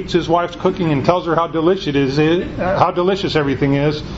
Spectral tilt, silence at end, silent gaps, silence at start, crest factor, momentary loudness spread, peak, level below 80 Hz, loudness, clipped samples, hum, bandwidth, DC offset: -7 dB/octave; 0 s; none; 0 s; 16 dB; 3 LU; 0 dBFS; -38 dBFS; -17 LUFS; under 0.1%; none; 8 kHz; under 0.1%